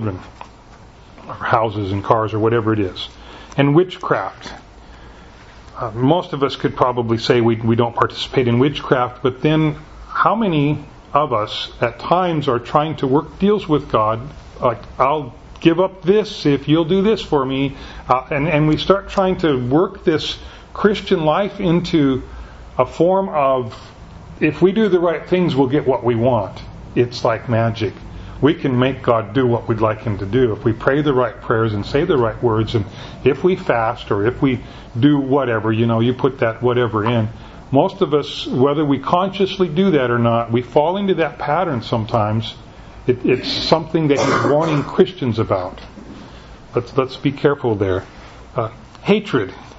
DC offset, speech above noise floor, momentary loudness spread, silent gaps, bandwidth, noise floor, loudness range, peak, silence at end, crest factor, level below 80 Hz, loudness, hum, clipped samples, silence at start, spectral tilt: under 0.1%; 25 dB; 11 LU; none; 8 kHz; -42 dBFS; 3 LU; 0 dBFS; 0 s; 18 dB; -42 dBFS; -18 LUFS; none; under 0.1%; 0 s; -7 dB/octave